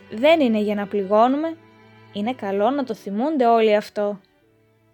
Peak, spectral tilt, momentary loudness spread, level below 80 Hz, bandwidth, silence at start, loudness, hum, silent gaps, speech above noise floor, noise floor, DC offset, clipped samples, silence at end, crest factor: -4 dBFS; -6.5 dB/octave; 12 LU; -74 dBFS; 18.5 kHz; 0.1 s; -20 LUFS; none; none; 40 dB; -59 dBFS; under 0.1%; under 0.1%; 0.75 s; 16 dB